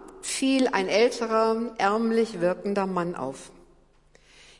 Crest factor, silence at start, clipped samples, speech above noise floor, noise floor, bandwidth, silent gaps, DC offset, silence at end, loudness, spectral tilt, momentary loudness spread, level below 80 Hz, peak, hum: 18 dB; 0 s; under 0.1%; 34 dB; -58 dBFS; 11.5 kHz; none; under 0.1%; 1.1 s; -25 LUFS; -4.5 dB/octave; 9 LU; -60 dBFS; -8 dBFS; none